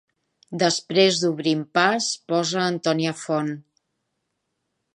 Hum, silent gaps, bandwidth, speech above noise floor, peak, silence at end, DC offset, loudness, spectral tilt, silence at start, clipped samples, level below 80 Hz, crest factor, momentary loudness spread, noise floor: none; none; 11 kHz; 55 dB; -4 dBFS; 1.35 s; under 0.1%; -22 LUFS; -4 dB/octave; 0.5 s; under 0.1%; -74 dBFS; 20 dB; 7 LU; -77 dBFS